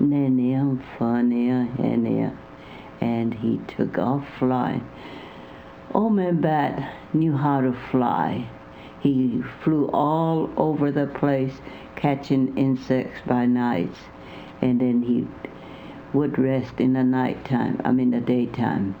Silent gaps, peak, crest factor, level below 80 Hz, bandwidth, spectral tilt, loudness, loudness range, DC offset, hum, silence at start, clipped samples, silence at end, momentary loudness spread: none; -4 dBFS; 18 dB; -54 dBFS; 6 kHz; -9.5 dB/octave; -23 LUFS; 2 LU; under 0.1%; none; 0 s; under 0.1%; 0 s; 18 LU